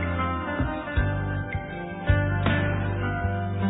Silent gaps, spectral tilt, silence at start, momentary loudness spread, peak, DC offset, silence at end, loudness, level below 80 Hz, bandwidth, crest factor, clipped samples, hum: none; -11 dB/octave; 0 s; 8 LU; -8 dBFS; under 0.1%; 0 s; -27 LUFS; -34 dBFS; 4 kHz; 18 dB; under 0.1%; none